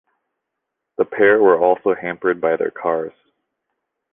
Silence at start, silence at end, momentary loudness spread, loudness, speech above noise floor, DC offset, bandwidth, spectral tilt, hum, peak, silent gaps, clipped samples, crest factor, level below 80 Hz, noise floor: 1 s; 1.05 s; 11 LU; -17 LUFS; 63 dB; under 0.1%; 3.7 kHz; -9 dB/octave; none; -2 dBFS; none; under 0.1%; 18 dB; -62 dBFS; -80 dBFS